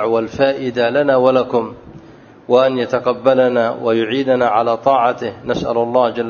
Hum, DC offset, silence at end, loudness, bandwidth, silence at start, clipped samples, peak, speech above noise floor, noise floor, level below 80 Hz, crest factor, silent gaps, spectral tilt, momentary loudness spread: none; under 0.1%; 0 s; -16 LUFS; 7 kHz; 0 s; under 0.1%; 0 dBFS; 26 dB; -41 dBFS; -52 dBFS; 16 dB; none; -6.5 dB/octave; 6 LU